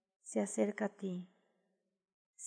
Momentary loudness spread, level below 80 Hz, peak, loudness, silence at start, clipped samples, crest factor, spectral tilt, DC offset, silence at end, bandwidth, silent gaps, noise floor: 11 LU; under -90 dBFS; -20 dBFS; -39 LUFS; 0.25 s; under 0.1%; 20 dB; -5.5 dB/octave; under 0.1%; 0 s; 11 kHz; 2.13-2.33 s; -83 dBFS